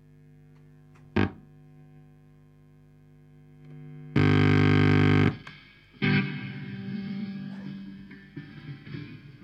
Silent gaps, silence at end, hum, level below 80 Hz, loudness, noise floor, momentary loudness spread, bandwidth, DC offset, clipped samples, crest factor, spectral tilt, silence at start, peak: none; 0.1 s; 50 Hz at -35 dBFS; -56 dBFS; -25 LUFS; -55 dBFS; 24 LU; 7.4 kHz; under 0.1%; under 0.1%; 20 dB; -8 dB/octave; 1.15 s; -10 dBFS